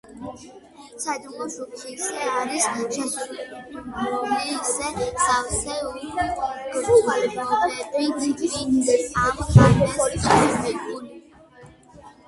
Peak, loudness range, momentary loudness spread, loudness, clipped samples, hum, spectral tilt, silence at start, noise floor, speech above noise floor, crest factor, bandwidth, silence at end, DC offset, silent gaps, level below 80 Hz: 0 dBFS; 8 LU; 17 LU; -22 LUFS; under 0.1%; none; -5 dB/octave; 0.1 s; -48 dBFS; 26 dB; 22 dB; 11.5 kHz; 0.15 s; under 0.1%; none; -42 dBFS